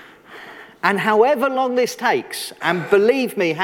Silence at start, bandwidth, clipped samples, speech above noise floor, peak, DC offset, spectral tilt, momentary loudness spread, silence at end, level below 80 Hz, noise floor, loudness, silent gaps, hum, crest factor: 0 s; 17.5 kHz; under 0.1%; 23 dB; -2 dBFS; under 0.1%; -4.5 dB/octave; 21 LU; 0 s; -66 dBFS; -40 dBFS; -18 LUFS; none; none; 18 dB